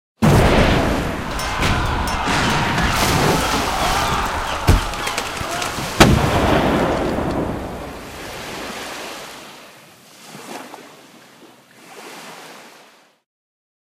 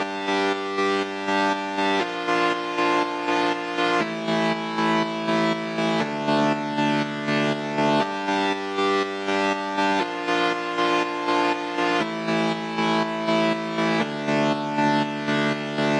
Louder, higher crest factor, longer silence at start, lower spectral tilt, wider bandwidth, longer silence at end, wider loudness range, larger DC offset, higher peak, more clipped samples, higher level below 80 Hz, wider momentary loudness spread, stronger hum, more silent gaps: first, -18 LUFS vs -23 LUFS; about the same, 20 dB vs 16 dB; first, 0.2 s vs 0 s; about the same, -4.5 dB/octave vs -5 dB/octave; first, 16.5 kHz vs 11 kHz; first, 1.3 s vs 0 s; first, 20 LU vs 0 LU; neither; first, 0 dBFS vs -8 dBFS; neither; first, -28 dBFS vs -66 dBFS; first, 22 LU vs 2 LU; neither; neither